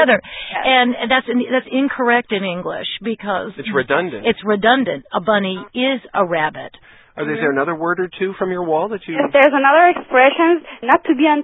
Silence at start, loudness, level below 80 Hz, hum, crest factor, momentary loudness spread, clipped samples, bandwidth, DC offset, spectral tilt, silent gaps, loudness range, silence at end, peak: 0 s; -17 LUFS; -56 dBFS; none; 16 dB; 11 LU; under 0.1%; 4 kHz; under 0.1%; -8 dB/octave; none; 6 LU; 0 s; 0 dBFS